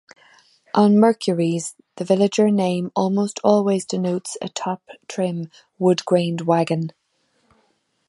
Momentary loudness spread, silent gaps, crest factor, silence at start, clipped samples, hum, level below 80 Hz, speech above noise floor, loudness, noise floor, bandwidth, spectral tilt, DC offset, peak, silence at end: 14 LU; none; 18 dB; 0.75 s; under 0.1%; none; -68 dBFS; 47 dB; -20 LUFS; -66 dBFS; 11.5 kHz; -6 dB/octave; under 0.1%; -2 dBFS; 1.2 s